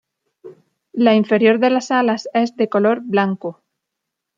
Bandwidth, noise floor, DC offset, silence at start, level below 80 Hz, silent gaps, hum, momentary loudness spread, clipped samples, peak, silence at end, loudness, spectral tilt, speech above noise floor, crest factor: 7.4 kHz; -80 dBFS; under 0.1%; 0.45 s; -70 dBFS; none; none; 9 LU; under 0.1%; -2 dBFS; 0.85 s; -17 LUFS; -6 dB/octave; 64 dB; 16 dB